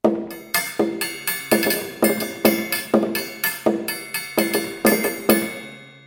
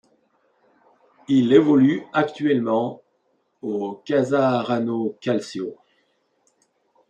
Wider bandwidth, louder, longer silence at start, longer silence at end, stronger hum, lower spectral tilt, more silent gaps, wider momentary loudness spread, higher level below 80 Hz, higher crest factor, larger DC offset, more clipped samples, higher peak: first, 17 kHz vs 8.8 kHz; about the same, -21 LUFS vs -21 LUFS; second, 0.05 s vs 1.3 s; second, 0.1 s vs 1.35 s; neither; second, -3.5 dB/octave vs -7 dB/octave; neither; second, 7 LU vs 14 LU; first, -60 dBFS vs -70 dBFS; about the same, 22 dB vs 20 dB; neither; neither; about the same, 0 dBFS vs -2 dBFS